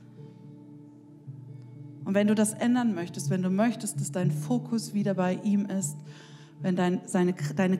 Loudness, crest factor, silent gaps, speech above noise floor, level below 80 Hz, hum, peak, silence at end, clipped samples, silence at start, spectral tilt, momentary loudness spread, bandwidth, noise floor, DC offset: -28 LUFS; 16 dB; none; 23 dB; -78 dBFS; none; -12 dBFS; 0 s; under 0.1%; 0 s; -6 dB/octave; 23 LU; 14.5 kHz; -50 dBFS; under 0.1%